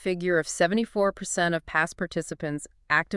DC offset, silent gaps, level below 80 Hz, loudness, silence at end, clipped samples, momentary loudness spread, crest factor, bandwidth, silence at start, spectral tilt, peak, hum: under 0.1%; none; -56 dBFS; -26 LUFS; 0 s; under 0.1%; 8 LU; 20 dB; 12 kHz; 0 s; -4 dB/octave; -8 dBFS; none